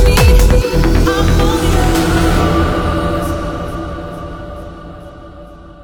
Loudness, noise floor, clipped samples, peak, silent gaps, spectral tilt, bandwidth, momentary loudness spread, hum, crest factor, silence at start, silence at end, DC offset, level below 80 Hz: -13 LUFS; -34 dBFS; under 0.1%; 0 dBFS; none; -5.5 dB/octave; 19.5 kHz; 21 LU; none; 12 dB; 0 s; 0.1 s; under 0.1%; -16 dBFS